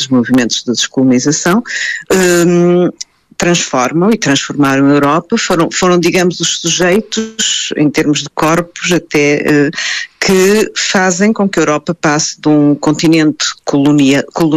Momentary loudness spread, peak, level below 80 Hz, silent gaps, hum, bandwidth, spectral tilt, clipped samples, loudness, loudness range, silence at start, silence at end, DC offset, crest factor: 5 LU; 0 dBFS; -46 dBFS; none; none; 14 kHz; -4 dB/octave; under 0.1%; -11 LUFS; 1 LU; 0 s; 0 s; under 0.1%; 10 dB